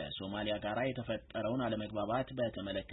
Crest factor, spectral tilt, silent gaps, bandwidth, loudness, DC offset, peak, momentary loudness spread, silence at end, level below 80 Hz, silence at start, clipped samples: 16 dB; -4 dB/octave; none; 4 kHz; -37 LUFS; under 0.1%; -22 dBFS; 5 LU; 0 s; -58 dBFS; 0 s; under 0.1%